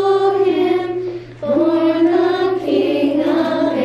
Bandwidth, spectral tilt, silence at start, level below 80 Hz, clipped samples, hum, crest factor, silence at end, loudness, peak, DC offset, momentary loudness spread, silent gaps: 8.2 kHz; -7 dB/octave; 0 s; -54 dBFS; under 0.1%; none; 10 dB; 0 s; -16 LUFS; -6 dBFS; under 0.1%; 7 LU; none